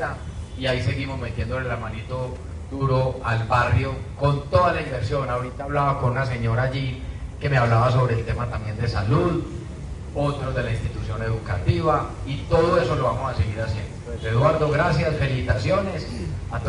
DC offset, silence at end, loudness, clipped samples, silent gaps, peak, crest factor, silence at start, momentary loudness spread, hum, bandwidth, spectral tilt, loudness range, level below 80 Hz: under 0.1%; 0 s; -23 LUFS; under 0.1%; none; -4 dBFS; 18 dB; 0 s; 11 LU; none; 10.5 kHz; -7 dB/octave; 3 LU; -36 dBFS